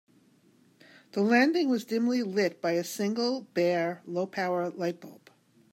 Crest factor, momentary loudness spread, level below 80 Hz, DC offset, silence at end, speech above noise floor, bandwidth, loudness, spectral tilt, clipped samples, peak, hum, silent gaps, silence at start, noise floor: 18 dB; 10 LU; -82 dBFS; under 0.1%; 0.6 s; 35 dB; 16 kHz; -28 LUFS; -5 dB/octave; under 0.1%; -12 dBFS; none; none; 1.15 s; -63 dBFS